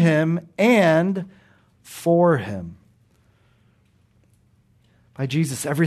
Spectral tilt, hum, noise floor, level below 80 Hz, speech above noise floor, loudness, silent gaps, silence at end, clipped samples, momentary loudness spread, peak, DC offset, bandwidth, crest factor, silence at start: -6.5 dB/octave; none; -60 dBFS; -64 dBFS; 40 dB; -20 LUFS; none; 0 s; under 0.1%; 18 LU; -6 dBFS; under 0.1%; 13.5 kHz; 16 dB; 0 s